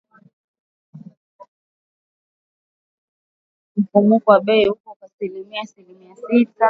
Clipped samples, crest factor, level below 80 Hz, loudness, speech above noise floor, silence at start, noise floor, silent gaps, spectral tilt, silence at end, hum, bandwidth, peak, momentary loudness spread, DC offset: under 0.1%; 20 dB; -64 dBFS; -18 LUFS; over 72 dB; 0.95 s; under -90 dBFS; 1.17-1.39 s, 1.48-3.75 s, 4.80-4.84 s, 4.96-5.00 s, 5.13-5.19 s; -8 dB/octave; 0 s; none; 6.6 kHz; 0 dBFS; 17 LU; under 0.1%